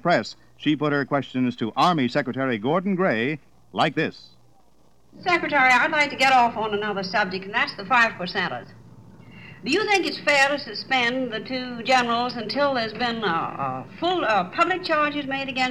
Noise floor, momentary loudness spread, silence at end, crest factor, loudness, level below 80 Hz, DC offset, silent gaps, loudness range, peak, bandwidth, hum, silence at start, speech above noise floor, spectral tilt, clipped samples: -60 dBFS; 10 LU; 0 s; 18 dB; -22 LUFS; -62 dBFS; 0.2%; none; 4 LU; -6 dBFS; 13 kHz; none; 0.05 s; 37 dB; -4.5 dB/octave; under 0.1%